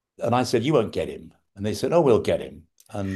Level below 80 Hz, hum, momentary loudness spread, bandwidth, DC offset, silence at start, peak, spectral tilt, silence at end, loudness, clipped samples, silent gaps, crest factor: -54 dBFS; none; 16 LU; 12.5 kHz; under 0.1%; 0.2 s; -6 dBFS; -6 dB/octave; 0 s; -23 LUFS; under 0.1%; none; 18 dB